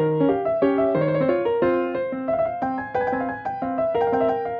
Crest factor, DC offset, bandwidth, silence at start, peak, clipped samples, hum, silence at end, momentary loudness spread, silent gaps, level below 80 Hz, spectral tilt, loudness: 14 dB; under 0.1%; 5.2 kHz; 0 s; -8 dBFS; under 0.1%; none; 0 s; 6 LU; none; -56 dBFS; -9.5 dB/octave; -23 LUFS